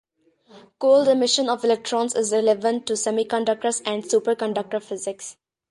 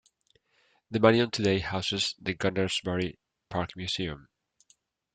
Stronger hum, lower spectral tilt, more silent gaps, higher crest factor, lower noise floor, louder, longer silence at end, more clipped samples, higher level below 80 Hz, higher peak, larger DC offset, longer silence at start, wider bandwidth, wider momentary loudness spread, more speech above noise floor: neither; second, -2.5 dB/octave vs -5 dB/octave; neither; second, 16 dB vs 26 dB; second, -57 dBFS vs -70 dBFS; first, -22 LUFS vs -28 LUFS; second, 0.4 s vs 0.95 s; neither; second, -72 dBFS vs -58 dBFS; about the same, -6 dBFS vs -4 dBFS; neither; second, 0.55 s vs 0.9 s; first, 11.5 kHz vs 9.4 kHz; about the same, 11 LU vs 13 LU; second, 36 dB vs 42 dB